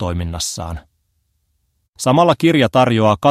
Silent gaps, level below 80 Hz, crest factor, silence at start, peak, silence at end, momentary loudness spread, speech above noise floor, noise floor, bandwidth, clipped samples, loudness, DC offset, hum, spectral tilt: 1.89-1.93 s; -38 dBFS; 16 dB; 0 s; 0 dBFS; 0 s; 14 LU; 51 dB; -66 dBFS; 15 kHz; under 0.1%; -15 LUFS; under 0.1%; none; -5.5 dB/octave